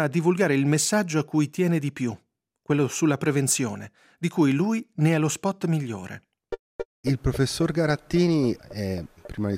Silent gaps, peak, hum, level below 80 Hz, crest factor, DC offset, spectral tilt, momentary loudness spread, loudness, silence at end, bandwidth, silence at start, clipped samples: 6.59-6.79 s, 6.85-7.03 s; -8 dBFS; none; -48 dBFS; 18 dB; under 0.1%; -5.5 dB/octave; 16 LU; -24 LUFS; 0 s; 16 kHz; 0 s; under 0.1%